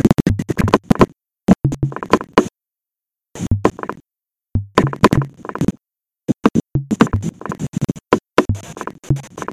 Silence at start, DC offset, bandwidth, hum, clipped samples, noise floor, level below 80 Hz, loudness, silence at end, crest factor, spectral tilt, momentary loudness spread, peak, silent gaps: 0.05 s; under 0.1%; 16 kHz; none; under 0.1%; -88 dBFS; -34 dBFS; -18 LUFS; 0 s; 18 dB; -7 dB/octave; 12 LU; 0 dBFS; none